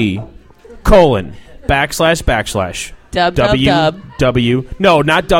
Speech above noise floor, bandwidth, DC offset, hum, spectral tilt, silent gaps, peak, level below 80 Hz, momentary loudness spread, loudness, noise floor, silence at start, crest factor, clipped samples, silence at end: 25 dB; 17 kHz; under 0.1%; none; -5 dB/octave; none; 0 dBFS; -26 dBFS; 12 LU; -13 LUFS; -37 dBFS; 0 s; 14 dB; under 0.1%; 0 s